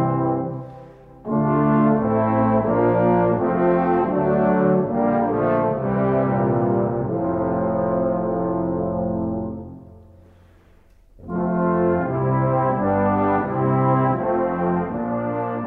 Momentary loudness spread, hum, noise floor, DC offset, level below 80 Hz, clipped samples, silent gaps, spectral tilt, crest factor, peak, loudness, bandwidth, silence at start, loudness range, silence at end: 7 LU; none; -52 dBFS; under 0.1%; -46 dBFS; under 0.1%; none; -12 dB/octave; 14 dB; -6 dBFS; -20 LUFS; 3.9 kHz; 0 s; 7 LU; 0 s